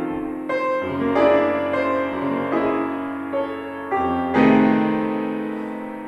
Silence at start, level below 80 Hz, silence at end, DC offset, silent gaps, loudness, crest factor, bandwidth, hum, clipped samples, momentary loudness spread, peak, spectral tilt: 0 s; -56 dBFS; 0 s; under 0.1%; none; -21 LUFS; 18 dB; 6.6 kHz; none; under 0.1%; 11 LU; -2 dBFS; -7.5 dB/octave